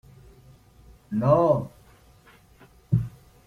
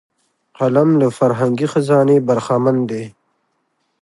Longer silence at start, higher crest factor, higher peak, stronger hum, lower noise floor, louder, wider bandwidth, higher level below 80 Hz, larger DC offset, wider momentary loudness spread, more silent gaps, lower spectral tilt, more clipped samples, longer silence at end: first, 1.1 s vs 0.6 s; first, 22 dB vs 14 dB; second, -6 dBFS vs -2 dBFS; neither; second, -55 dBFS vs -67 dBFS; second, -24 LUFS vs -15 LUFS; first, 13 kHz vs 11.5 kHz; first, -50 dBFS vs -64 dBFS; neither; first, 16 LU vs 9 LU; neither; first, -10 dB/octave vs -8 dB/octave; neither; second, 0.4 s vs 0.95 s